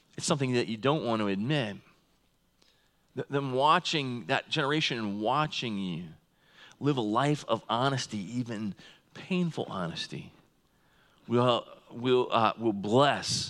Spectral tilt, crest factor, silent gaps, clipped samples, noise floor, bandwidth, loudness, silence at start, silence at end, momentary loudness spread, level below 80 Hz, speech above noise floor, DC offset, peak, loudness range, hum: -5 dB/octave; 20 dB; none; under 0.1%; -69 dBFS; 12.5 kHz; -29 LUFS; 0.2 s; 0 s; 14 LU; -72 dBFS; 40 dB; under 0.1%; -10 dBFS; 4 LU; none